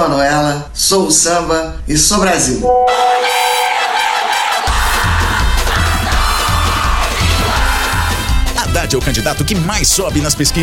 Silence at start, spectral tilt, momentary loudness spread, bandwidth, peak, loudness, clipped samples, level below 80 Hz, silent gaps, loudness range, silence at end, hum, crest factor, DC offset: 0 s; -3 dB/octave; 5 LU; 18 kHz; 0 dBFS; -13 LUFS; under 0.1%; -20 dBFS; none; 2 LU; 0 s; none; 12 dB; 0.7%